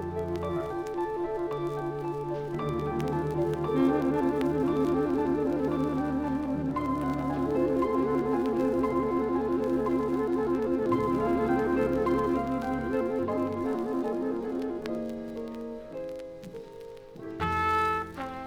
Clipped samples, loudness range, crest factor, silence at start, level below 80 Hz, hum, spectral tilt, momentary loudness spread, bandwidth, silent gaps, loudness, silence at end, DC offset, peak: under 0.1%; 5 LU; 14 dB; 0 s; -50 dBFS; none; -8 dB/octave; 11 LU; 15.5 kHz; none; -29 LUFS; 0 s; under 0.1%; -14 dBFS